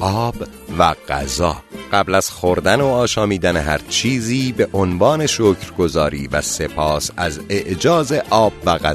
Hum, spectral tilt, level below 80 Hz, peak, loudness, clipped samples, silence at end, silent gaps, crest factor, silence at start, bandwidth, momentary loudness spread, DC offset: none; -4.5 dB/octave; -36 dBFS; 0 dBFS; -17 LUFS; under 0.1%; 0 s; none; 18 dB; 0 s; 13.5 kHz; 6 LU; under 0.1%